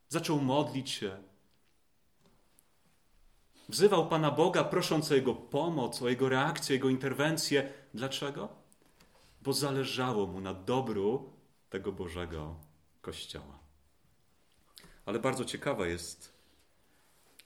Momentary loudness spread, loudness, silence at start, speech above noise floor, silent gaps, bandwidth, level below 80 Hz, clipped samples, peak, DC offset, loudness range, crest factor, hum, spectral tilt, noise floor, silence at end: 16 LU; -32 LUFS; 0.1 s; 43 dB; none; 17 kHz; -62 dBFS; under 0.1%; -12 dBFS; under 0.1%; 12 LU; 22 dB; none; -5 dB/octave; -75 dBFS; 1.2 s